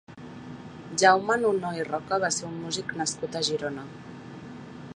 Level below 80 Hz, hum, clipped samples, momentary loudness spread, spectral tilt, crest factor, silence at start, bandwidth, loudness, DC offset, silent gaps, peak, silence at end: -64 dBFS; none; under 0.1%; 22 LU; -3 dB/octave; 24 dB; 0.1 s; 11 kHz; -26 LUFS; under 0.1%; none; -4 dBFS; 0.05 s